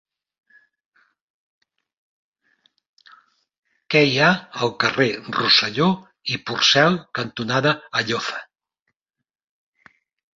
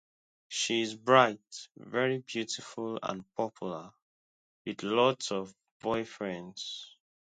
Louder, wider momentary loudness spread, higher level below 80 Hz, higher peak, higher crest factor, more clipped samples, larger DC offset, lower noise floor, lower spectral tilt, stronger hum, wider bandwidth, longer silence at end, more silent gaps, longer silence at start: first, -19 LUFS vs -31 LUFS; second, 12 LU vs 19 LU; first, -64 dBFS vs -74 dBFS; first, -2 dBFS vs -8 dBFS; about the same, 20 dB vs 24 dB; neither; neither; second, -77 dBFS vs under -90 dBFS; about the same, -4 dB/octave vs -3.5 dB/octave; neither; second, 7.6 kHz vs 9.4 kHz; first, 1.9 s vs 0.45 s; second, none vs 4.02-4.65 s, 5.71-5.80 s; first, 3.9 s vs 0.5 s